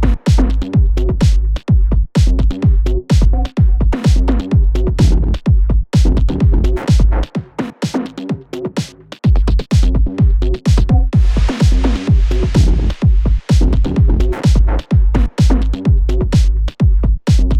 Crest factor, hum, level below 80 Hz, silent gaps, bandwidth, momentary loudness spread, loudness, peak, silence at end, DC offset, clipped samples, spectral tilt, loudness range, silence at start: 10 dB; none; -14 dBFS; none; 9 kHz; 6 LU; -15 LUFS; 0 dBFS; 0 s; under 0.1%; under 0.1%; -7.5 dB/octave; 3 LU; 0 s